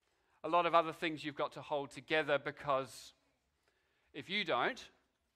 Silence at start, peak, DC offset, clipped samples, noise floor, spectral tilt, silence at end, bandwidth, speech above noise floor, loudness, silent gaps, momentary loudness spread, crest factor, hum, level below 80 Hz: 0.45 s; -16 dBFS; under 0.1%; under 0.1%; -79 dBFS; -4.5 dB/octave; 0.5 s; 14.5 kHz; 43 dB; -36 LUFS; none; 17 LU; 22 dB; none; -76 dBFS